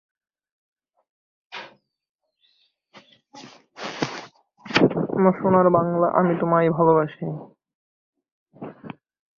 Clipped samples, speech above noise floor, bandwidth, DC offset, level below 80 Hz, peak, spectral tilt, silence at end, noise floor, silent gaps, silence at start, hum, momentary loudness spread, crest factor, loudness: under 0.1%; 47 dB; 7.2 kHz; under 0.1%; -62 dBFS; -2 dBFS; -7 dB/octave; 0.45 s; -66 dBFS; 2.09-2.19 s, 7.75-8.13 s, 8.32-8.46 s; 1.5 s; none; 22 LU; 22 dB; -20 LUFS